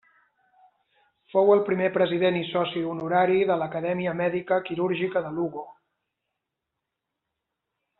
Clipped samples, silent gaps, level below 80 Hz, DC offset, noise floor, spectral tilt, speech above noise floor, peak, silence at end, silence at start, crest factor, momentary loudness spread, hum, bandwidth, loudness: under 0.1%; none; -68 dBFS; under 0.1%; -84 dBFS; -4.5 dB/octave; 60 dB; -8 dBFS; 2.3 s; 1.35 s; 20 dB; 9 LU; none; 4.2 kHz; -25 LUFS